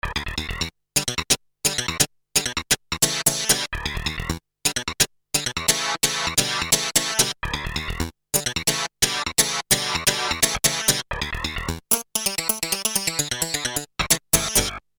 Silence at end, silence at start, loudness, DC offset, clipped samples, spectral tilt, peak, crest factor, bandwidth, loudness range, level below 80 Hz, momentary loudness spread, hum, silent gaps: 0.2 s; 0.05 s; -21 LUFS; under 0.1%; under 0.1%; -1 dB/octave; 0 dBFS; 24 dB; over 20 kHz; 2 LU; -40 dBFS; 9 LU; none; none